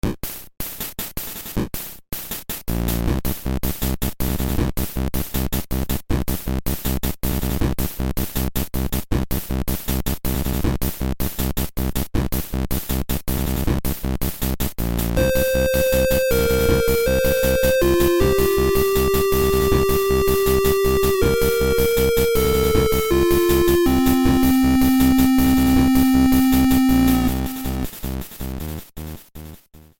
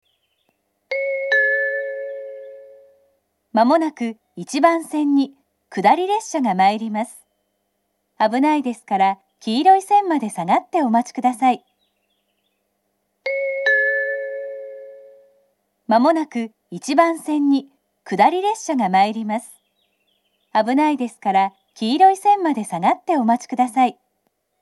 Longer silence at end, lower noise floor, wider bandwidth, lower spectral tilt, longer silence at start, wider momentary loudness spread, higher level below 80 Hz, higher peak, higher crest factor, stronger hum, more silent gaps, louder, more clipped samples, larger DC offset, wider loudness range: second, 0.2 s vs 0.7 s; second, -44 dBFS vs -72 dBFS; first, 17 kHz vs 12.5 kHz; about the same, -5.5 dB/octave vs -4.5 dB/octave; second, 0.05 s vs 0.9 s; about the same, 12 LU vs 13 LU; first, -26 dBFS vs -80 dBFS; second, -4 dBFS vs 0 dBFS; second, 14 dB vs 20 dB; neither; neither; about the same, -20 LUFS vs -19 LUFS; neither; neither; first, 8 LU vs 5 LU